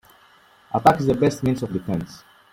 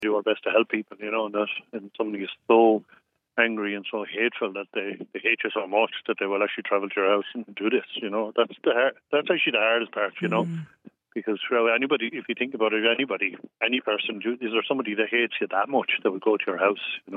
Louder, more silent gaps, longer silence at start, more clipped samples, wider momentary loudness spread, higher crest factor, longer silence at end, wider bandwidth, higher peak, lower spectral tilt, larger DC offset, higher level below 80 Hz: first, -21 LUFS vs -25 LUFS; neither; first, 0.7 s vs 0 s; neither; about the same, 11 LU vs 9 LU; about the same, 22 dB vs 20 dB; first, 0.35 s vs 0 s; first, 16.5 kHz vs 4 kHz; first, -2 dBFS vs -6 dBFS; about the same, -7 dB/octave vs -7 dB/octave; neither; first, -50 dBFS vs -86 dBFS